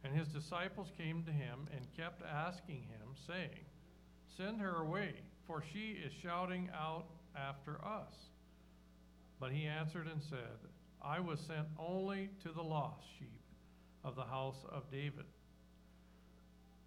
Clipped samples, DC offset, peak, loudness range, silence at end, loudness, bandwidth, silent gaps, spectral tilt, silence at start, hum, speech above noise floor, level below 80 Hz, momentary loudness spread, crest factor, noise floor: under 0.1%; under 0.1%; -26 dBFS; 4 LU; 0 s; -45 LUFS; 12 kHz; none; -7 dB/octave; 0 s; none; 20 dB; -68 dBFS; 24 LU; 20 dB; -65 dBFS